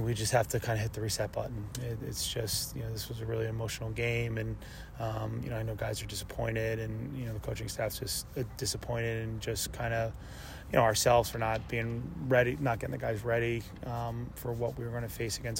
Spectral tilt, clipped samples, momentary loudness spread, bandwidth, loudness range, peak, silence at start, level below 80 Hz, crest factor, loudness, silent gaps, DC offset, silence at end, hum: -4.5 dB/octave; under 0.1%; 10 LU; 16.5 kHz; 6 LU; -12 dBFS; 0 s; -48 dBFS; 20 dB; -33 LUFS; none; under 0.1%; 0 s; none